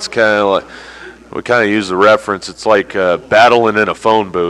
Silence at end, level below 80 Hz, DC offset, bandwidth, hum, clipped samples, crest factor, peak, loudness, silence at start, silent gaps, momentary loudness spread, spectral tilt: 0 s; -48 dBFS; under 0.1%; 11.5 kHz; none; under 0.1%; 12 dB; 0 dBFS; -12 LUFS; 0 s; none; 17 LU; -4.5 dB/octave